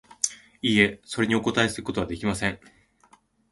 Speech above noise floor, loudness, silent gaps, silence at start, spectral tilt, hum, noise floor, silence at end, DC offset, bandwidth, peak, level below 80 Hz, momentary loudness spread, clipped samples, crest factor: 35 dB; -25 LUFS; none; 0.25 s; -3.5 dB/octave; none; -60 dBFS; 0.95 s; under 0.1%; 11.5 kHz; -4 dBFS; -50 dBFS; 9 LU; under 0.1%; 24 dB